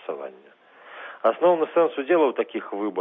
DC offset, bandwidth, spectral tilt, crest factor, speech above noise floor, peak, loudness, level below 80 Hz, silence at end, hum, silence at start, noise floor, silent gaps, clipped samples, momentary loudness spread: under 0.1%; 3.9 kHz; -8 dB/octave; 16 dB; 20 dB; -8 dBFS; -22 LUFS; -90 dBFS; 0 s; none; 0.1 s; -42 dBFS; none; under 0.1%; 19 LU